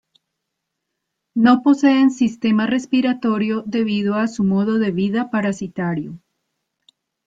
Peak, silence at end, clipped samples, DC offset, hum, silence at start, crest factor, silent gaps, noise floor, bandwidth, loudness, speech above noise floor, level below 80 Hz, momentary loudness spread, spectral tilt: -2 dBFS; 1.1 s; under 0.1%; under 0.1%; none; 1.35 s; 18 dB; none; -78 dBFS; 7.8 kHz; -18 LUFS; 61 dB; -60 dBFS; 10 LU; -6.5 dB/octave